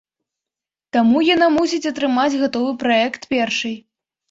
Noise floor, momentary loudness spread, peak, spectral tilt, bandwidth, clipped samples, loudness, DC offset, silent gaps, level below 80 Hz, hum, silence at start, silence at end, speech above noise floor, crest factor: -88 dBFS; 8 LU; -2 dBFS; -4 dB/octave; 7.8 kHz; under 0.1%; -18 LUFS; under 0.1%; none; -58 dBFS; none; 0.95 s; 0.5 s; 71 dB; 16 dB